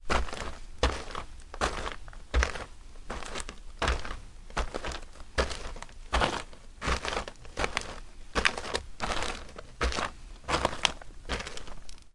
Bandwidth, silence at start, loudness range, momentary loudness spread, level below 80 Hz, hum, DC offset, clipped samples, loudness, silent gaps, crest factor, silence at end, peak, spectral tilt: 11.5 kHz; 0 s; 4 LU; 17 LU; -38 dBFS; none; under 0.1%; under 0.1%; -33 LUFS; none; 32 dB; 0.05 s; 0 dBFS; -3.5 dB/octave